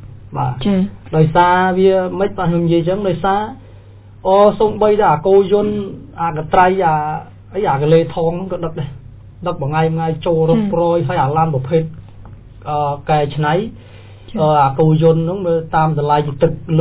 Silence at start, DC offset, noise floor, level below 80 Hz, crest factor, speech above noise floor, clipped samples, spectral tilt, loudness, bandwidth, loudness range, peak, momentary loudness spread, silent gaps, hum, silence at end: 0 s; under 0.1%; -39 dBFS; -40 dBFS; 16 dB; 24 dB; under 0.1%; -11.5 dB/octave; -15 LUFS; 4 kHz; 4 LU; 0 dBFS; 12 LU; none; none; 0 s